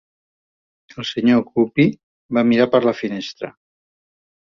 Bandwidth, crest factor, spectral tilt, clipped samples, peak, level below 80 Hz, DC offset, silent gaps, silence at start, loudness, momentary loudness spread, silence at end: 7 kHz; 18 dB; -7 dB/octave; under 0.1%; -2 dBFS; -60 dBFS; under 0.1%; 2.03-2.29 s; 0.95 s; -18 LUFS; 14 LU; 1.1 s